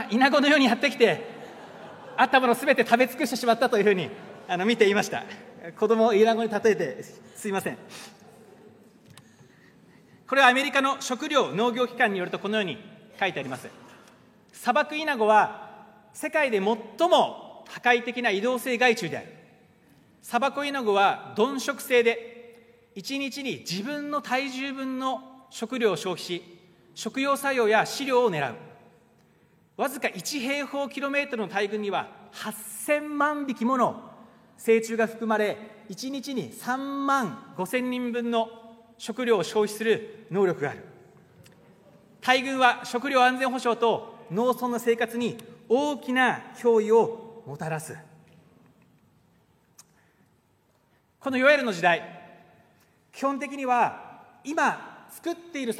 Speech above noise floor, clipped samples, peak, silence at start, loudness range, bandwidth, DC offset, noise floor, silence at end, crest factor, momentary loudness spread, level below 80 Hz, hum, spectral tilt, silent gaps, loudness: 41 dB; under 0.1%; -4 dBFS; 0 s; 6 LU; 16 kHz; under 0.1%; -66 dBFS; 0 s; 24 dB; 17 LU; -78 dBFS; none; -4 dB/octave; none; -25 LUFS